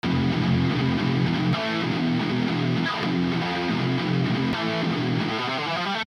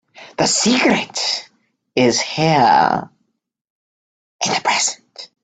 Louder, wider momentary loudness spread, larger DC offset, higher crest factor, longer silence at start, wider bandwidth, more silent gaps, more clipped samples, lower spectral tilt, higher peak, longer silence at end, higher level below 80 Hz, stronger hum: second, -24 LUFS vs -16 LUFS; second, 3 LU vs 11 LU; neither; second, 12 dB vs 18 dB; second, 0.05 s vs 0.2 s; about the same, 10 kHz vs 9.4 kHz; second, none vs 3.61-4.39 s; neither; first, -6.5 dB/octave vs -3 dB/octave; second, -10 dBFS vs 0 dBFS; second, 0.05 s vs 0.2 s; first, -50 dBFS vs -58 dBFS; neither